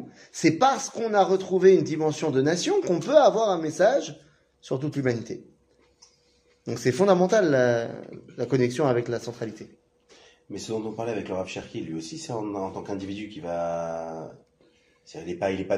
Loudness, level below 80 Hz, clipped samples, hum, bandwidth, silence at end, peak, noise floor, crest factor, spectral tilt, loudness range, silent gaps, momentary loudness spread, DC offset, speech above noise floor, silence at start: -25 LUFS; -66 dBFS; under 0.1%; none; 11 kHz; 0 s; -4 dBFS; -64 dBFS; 20 dB; -5.5 dB/octave; 11 LU; none; 18 LU; under 0.1%; 39 dB; 0 s